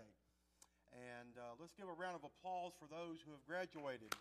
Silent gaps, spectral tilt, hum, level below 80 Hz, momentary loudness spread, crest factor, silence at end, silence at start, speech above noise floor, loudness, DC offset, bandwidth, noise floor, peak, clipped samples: none; -4 dB/octave; none; -84 dBFS; 9 LU; 26 dB; 0 s; 0 s; 29 dB; -52 LUFS; under 0.1%; 14.5 kHz; -80 dBFS; -26 dBFS; under 0.1%